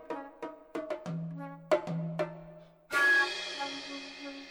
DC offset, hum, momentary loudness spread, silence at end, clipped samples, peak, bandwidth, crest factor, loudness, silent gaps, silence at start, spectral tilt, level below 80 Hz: under 0.1%; none; 19 LU; 0 s; under 0.1%; -14 dBFS; 19.5 kHz; 20 dB; -32 LUFS; none; 0 s; -4.5 dB/octave; -72 dBFS